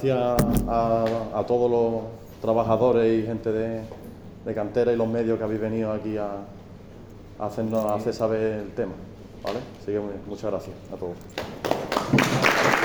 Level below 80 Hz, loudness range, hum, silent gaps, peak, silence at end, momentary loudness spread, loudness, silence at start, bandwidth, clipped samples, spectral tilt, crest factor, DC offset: -44 dBFS; 7 LU; none; none; -4 dBFS; 0 s; 18 LU; -25 LUFS; 0 s; over 20 kHz; under 0.1%; -6 dB/octave; 22 dB; under 0.1%